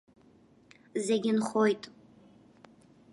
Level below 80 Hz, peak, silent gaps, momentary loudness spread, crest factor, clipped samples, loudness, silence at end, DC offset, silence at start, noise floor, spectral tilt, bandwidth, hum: -78 dBFS; -14 dBFS; none; 11 LU; 18 dB; under 0.1%; -30 LUFS; 1.25 s; under 0.1%; 0.95 s; -61 dBFS; -5 dB/octave; 11.5 kHz; none